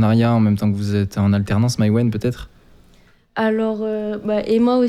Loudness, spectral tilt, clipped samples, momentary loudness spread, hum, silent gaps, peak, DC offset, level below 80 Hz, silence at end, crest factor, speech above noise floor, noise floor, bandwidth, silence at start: -19 LUFS; -7.5 dB/octave; under 0.1%; 8 LU; none; none; -6 dBFS; under 0.1%; -46 dBFS; 0 s; 12 dB; 34 dB; -52 dBFS; 13.5 kHz; 0 s